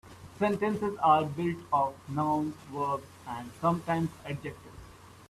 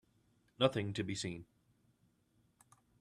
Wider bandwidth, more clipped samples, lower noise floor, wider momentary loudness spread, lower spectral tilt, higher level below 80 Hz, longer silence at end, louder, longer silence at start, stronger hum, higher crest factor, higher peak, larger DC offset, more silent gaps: about the same, 14 kHz vs 13 kHz; neither; second, -51 dBFS vs -75 dBFS; first, 17 LU vs 10 LU; first, -7 dB/octave vs -5 dB/octave; first, -62 dBFS vs -74 dBFS; second, 0.05 s vs 1.55 s; first, -30 LUFS vs -37 LUFS; second, 0.05 s vs 0.6 s; neither; second, 20 dB vs 28 dB; first, -10 dBFS vs -14 dBFS; neither; neither